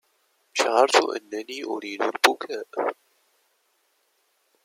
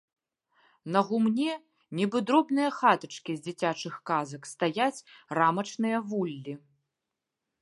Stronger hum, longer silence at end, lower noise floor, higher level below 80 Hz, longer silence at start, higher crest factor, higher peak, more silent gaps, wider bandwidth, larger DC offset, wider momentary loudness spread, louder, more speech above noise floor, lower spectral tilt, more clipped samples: neither; first, 1.7 s vs 1.05 s; second, -69 dBFS vs -87 dBFS; about the same, -82 dBFS vs -80 dBFS; second, 0.55 s vs 0.85 s; about the same, 26 dB vs 22 dB; first, -2 dBFS vs -8 dBFS; neither; first, 16.5 kHz vs 11.5 kHz; neither; about the same, 13 LU vs 14 LU; first, -24 LUFS vs -29 LUFS; second, 45 dB vs 58 dB; second, -0.5 dB/octave vs -5.5 dB/octave; neither